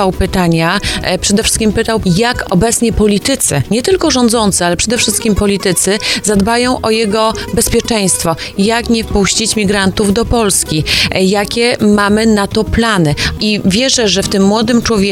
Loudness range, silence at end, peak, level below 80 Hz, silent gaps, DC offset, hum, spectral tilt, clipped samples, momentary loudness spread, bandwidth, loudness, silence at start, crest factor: 1 LU; 0 s; 0 dBFS; -28 dBFS; none; under 0.1%; none; -4 dB/octave; under 0.1%; 3 LU; 16.5 kHz; -11 LUFS; 0 s; 12 dB